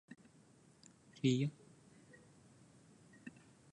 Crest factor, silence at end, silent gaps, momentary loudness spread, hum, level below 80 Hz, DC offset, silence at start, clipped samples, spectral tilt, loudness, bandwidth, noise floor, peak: 24 dB; 0.45 s; none; 29 LU; none; -82 dBFS; under 0.1%; 0.1 s; under 0.1%; -6.5 dB/octave; -38 LUFS; 10.5 kHz; -66 dBFS; -22 dBFS